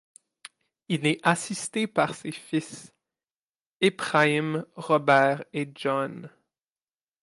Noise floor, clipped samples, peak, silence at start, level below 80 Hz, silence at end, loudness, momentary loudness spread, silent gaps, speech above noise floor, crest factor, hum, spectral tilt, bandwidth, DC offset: under -90 dBFS; under 0.1%; -6 dBFS; 0.9 s; -76 dBFS; 0.95 s; -25 LUFS; 13 LU; 3.36-3.53 s, 3.66-3.80 s; over 64 dB; 22 dB; none; -4.5 dB/octave; 11.5 kHz; under 0.1%